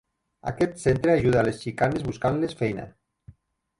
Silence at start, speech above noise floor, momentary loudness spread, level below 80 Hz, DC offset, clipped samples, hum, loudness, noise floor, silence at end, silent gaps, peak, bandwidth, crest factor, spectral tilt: 0.45 s; 31 dB; 14 LU; -48 dBFS; under 0.1%; under 0.1%; none; -25 LUFS; -55 dBFS; 0.9 s; none; -8 dBFS; 11.5 kHz; 18 dB; -7 dB/octave